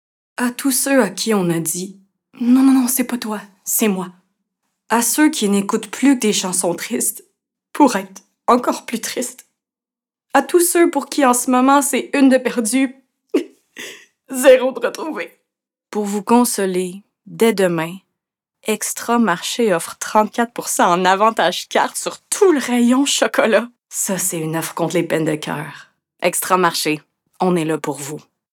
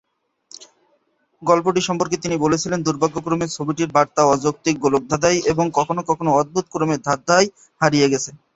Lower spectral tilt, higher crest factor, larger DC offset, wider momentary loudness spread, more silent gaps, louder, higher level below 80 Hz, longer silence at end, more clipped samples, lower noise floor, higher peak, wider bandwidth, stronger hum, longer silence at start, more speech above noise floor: about the same, -3.5 dB/octave vs -4.5 dB/octave; about the same, 18 dB vs 18 dB; neither; first, 13 LU vs 6 LU; neither; about the same, -17 LUFS vs -19 LUFS; second, -68 dBFS vs -52 dBFS; first, 0.35 s vs 0.2 s; neither; first, under -90 dBFS vs -64 dBFS; about the same, 0 dBFS vs 0 dBFS; first, 19.5 kHz vs 8.2 kHz; neither; second, 0.4 s vs 0.6 s; first, over 73 dB vs 46 dB